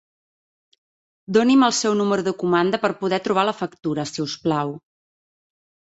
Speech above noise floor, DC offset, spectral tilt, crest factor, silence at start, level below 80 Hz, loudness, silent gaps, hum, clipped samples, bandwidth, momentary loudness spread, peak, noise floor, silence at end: over 70 dB; under 0.1%; -4.5 dB/octave; 18 dB; 1.3 s; -64 dBFS; -21 LUFS; none; none; under 0.1%; 8.2 kHz; 10 LU; -4 dBFS; under -90 dBFS; 1.1 s